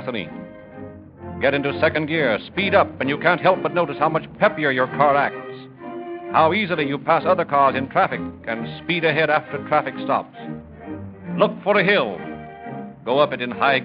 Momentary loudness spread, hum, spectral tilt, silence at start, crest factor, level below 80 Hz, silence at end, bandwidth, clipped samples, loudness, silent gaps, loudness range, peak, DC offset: 17 LU; none; -10.5 dB/octave; 0 s; 20 dB; -56 dBFS; 0 s; 5.2 kHz; under 0.1%; -20 LUFS; none; 3 LU; -2 dBFS; under 0.1%